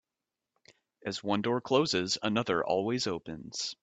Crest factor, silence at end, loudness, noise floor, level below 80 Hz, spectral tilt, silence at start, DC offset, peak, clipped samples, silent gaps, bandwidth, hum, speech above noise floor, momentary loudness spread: 20 dB; 0.1 s; -31 LUFS; -89 dBFS; -68 dBFS; -4 dB/octave; 1.05 s; under 0.1%; -12 dBFS; under 0.1%; none; 9 kHz; none; 58 dB; 11 LU